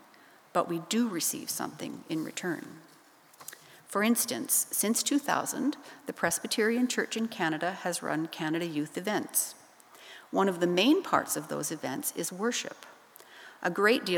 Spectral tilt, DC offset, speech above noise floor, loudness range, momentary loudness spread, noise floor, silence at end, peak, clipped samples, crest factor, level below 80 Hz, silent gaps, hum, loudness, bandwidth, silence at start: -3 dB/octave; under 0.1%; 27 dB; 5 LU; 16 LU; -57 dBFS; 0 s; -10 dBFS; under 0.1%; 22 dB; -80 dBFS; none; none; -30 LUFS; over 20 kHz; 0.55 s